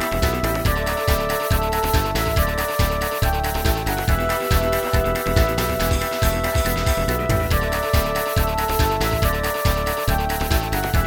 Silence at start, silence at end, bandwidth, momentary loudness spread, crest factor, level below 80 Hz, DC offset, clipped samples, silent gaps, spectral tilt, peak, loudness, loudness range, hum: 0 s; 0 s; 18 kHz; 2 LU; 16 dB; -24 dBFS; under 0.1%; under 0.1%; none; -4.5 dB/octave; -4 dBFS; -21 LUFS; 0 LU; none